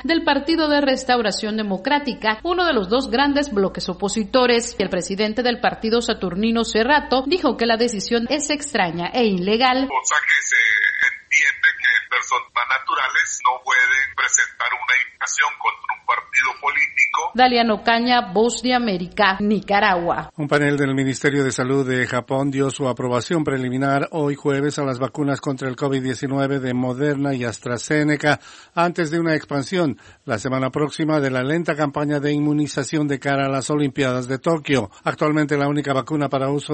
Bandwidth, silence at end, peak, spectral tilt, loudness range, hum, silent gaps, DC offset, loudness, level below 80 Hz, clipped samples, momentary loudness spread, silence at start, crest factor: 8.8 kHz; 0 s; 0 dBFS; -4 dB/octave; 5 LU; none; none; under 0.1%; -19 LUFS; -50 dBFS; under 0.1%; 7 LU; 0 s; 20 dB